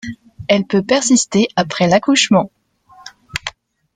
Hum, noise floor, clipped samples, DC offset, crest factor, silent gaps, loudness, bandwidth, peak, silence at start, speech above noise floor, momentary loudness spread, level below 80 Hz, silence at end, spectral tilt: none; -47 dBFS; under 0.1%; under 0.1%; 16 dB; none; -15 LUFS; 9.6 kHz; 0 dBFS; 0.05 s; 33 dB; 16 LU; -52 dBFS; 0.45 s; -4 dB/octave